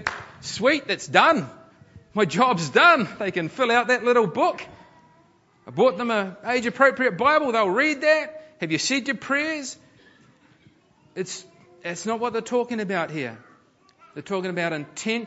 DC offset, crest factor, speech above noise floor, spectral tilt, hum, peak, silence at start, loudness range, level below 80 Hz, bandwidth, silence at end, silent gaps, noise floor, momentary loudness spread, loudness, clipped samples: under 0.1%; 24 dB; 36 dB; -4 dB/octave; none; 0 dBFS; 0 s; 9 LU; -66 dBFS; 8 kHz; 0 s; none; -59 dBFS; 17 LU; -22 LUFS; under 0.1%